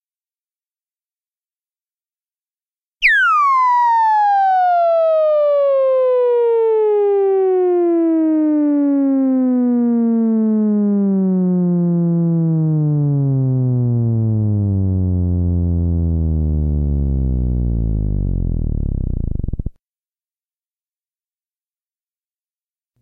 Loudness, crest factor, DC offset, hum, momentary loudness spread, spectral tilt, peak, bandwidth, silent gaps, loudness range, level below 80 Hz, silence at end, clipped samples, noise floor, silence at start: -16 LUFS; 14 dB; under 0.1%; none; 7 LU; -9.5 dB/octave; -2 dBFS; 6.4 kHz; none; 9 LU; -28 dBFS; 3.3 s; under 0.1%; under -90 dBFS; 3 s